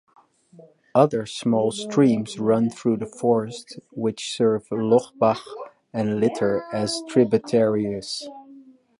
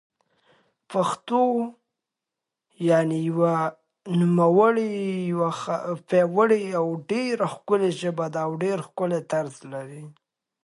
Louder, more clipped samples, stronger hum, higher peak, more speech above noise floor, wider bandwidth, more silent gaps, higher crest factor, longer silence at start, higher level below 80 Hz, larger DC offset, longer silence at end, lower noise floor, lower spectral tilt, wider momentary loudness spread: about the same, -22 LUFS vs -24 LUFS; neither; neither; about the same, -4 dBFS vs -6 dBFS; second, 27 dB vs 63 dB; about the same, 11.5 kHz vs 11.5 kHz; neither; about the same, 18 dB vs 18 dB; about the same, 0.95 s vs 0.9 s; first, -64 dBFS vs -74 dBFS; neither; second, 0.4 s vs 0.55 s; second, -49 dBFS vs -86 dBFS; about the same, -6 dB/octave vs -7 dB/octave; about the same, 12 LU vs 10 LU